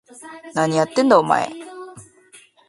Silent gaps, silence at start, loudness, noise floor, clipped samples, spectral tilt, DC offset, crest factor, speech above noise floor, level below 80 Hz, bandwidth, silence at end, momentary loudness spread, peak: none; 0.25 s; -18 LUFS; -50 dBFS; under 0.1%; -5 dB/octave; under 0.1%; 20 dB; 33 dB; -66 dBFS; 11.5 kHz; 0.7 s; 23 LU; 0 dBFS